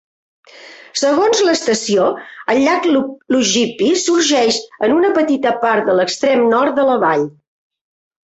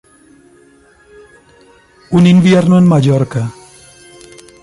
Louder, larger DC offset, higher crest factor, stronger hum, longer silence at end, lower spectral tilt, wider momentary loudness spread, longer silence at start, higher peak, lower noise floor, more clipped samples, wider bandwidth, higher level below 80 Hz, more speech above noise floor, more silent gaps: second, -15 LUFS vs -10 LUFS; neither; about the same, 14 dB vs 12 dB; neither; about the same, 1 s vs 1.1 s; second, -3 dB/octave vs -7.5 dB/octave; second, 5 LU vs 12 LU; second, 0.6 s vs 2.1 s; about the same, -2 dBFS vs -2 dBFS; second, -39 dBFS vs -46 dBFS; neither; second, 8.2 kHz vs 11.5 kHz; second, -58 dBFS vs -48 dBFS; second, 25 dB vs 38 dB; neither